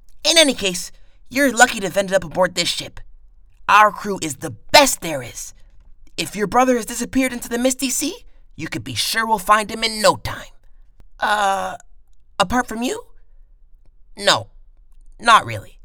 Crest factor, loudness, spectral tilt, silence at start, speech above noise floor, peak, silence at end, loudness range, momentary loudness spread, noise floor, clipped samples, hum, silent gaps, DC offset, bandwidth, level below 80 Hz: 20 dB; -18 LUFS; -2.5 dB/octave; 0.1 s; 26 dB; 0 dBFS; 0.2 s; 6 LU; 17 LU; -45 dBFS; under 0.1%; none; none; under 0.1%; over 20 kHz; -44 dBFS